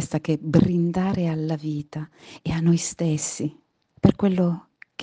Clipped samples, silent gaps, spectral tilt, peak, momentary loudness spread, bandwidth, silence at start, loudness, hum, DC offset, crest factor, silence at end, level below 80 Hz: under 0.1%; none; -6.5 dB/octave; -2 dBFS; 14 LU; 9.8 kHz; 0 s; -23 LUFS; none; under 0.1%; 22 dB; 0 s; -50 dBFS